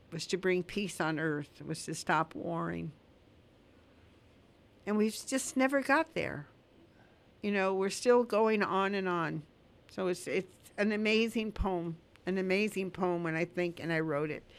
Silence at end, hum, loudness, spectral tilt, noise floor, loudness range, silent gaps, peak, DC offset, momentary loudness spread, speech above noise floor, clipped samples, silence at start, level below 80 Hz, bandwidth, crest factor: 0 s; none; -33 LUFS; -5 dB/octave; -62 dBFS; 7 LU; none; -14 dBFS; under 0.1%; 11 LU; 30 dB; under 0.1%; 0.1 s; -54 dBFS; 15.5 kHz; 20 dB